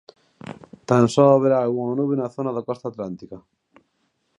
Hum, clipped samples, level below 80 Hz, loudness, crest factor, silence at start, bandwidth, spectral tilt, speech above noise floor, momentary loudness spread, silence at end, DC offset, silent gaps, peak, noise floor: none; under 0.1%; -64 dBFS; -20 LUFS; 20 dB; 0.45 s; 10.5 kHz; -7.5 dB/octave; 50 dB; 24 LU; 1 s; under 0.1%; none; -2 dBFS; -70 dBFS